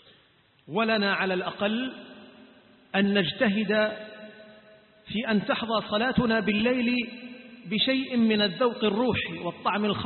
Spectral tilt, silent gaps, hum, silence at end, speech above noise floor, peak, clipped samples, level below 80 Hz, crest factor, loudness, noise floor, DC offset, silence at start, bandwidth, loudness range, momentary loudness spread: -10 dB/octave; none; none; 0 s; 36 dB; -10 dBFS; under 0.1%; -56 dBFS; 16 dB; -26 LUFS; -62 dBFS; under 0.1%; 0.7 s; 4.4 kHz; 3 LU; 15 LU